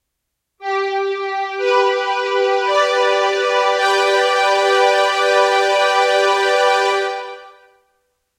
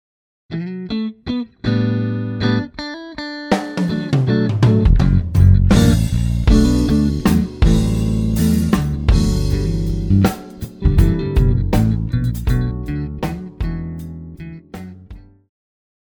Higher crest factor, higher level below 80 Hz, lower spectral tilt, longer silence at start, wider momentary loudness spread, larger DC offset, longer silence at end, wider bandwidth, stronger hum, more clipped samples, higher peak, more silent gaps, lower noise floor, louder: about the same, 14 dB vs 16 dB; second, -74 dBFS vs -22 dBFS; second, 0.5 dB/octave vs -7 dB/octave; about the same, 0.6 s vs 0.5 s; second, 7 LU vs 15 LU; neither; about the same, 0.9 s vs 0.85 s; second, 15 kHz vs over 20 kHz; neither; neither; about the same, -2 dBFS vs 0 dBFS; neither; first, -76 dBFS vs -39 dBFS; about the same, -15 LUFS vs -17 LUFS